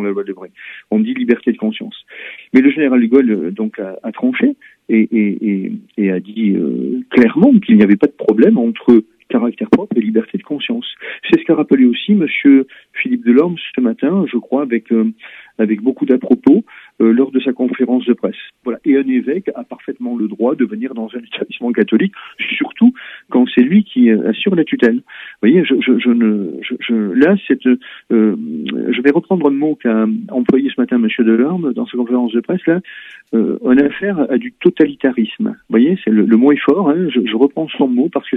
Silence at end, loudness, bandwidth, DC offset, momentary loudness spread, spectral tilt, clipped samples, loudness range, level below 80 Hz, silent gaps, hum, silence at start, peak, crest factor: 0 s; -14 LUFS; 4 kHz; under 0.1%; 12 LU; -9 dB/octave; under 0.1%; 4 LU; -60 dBFS; none; none; 0 s; 0 dBFS; 14 dB